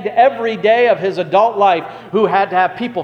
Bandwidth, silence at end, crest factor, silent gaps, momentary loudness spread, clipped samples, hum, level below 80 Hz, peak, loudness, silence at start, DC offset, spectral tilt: 6.8 kHz; 0 s; 14 dB; none; 5 LU; under 0.1%; none; -62 dBFS; 0 dBFS; -14 LUFS; 0 s; under 0.1%; -6.5 dB/octave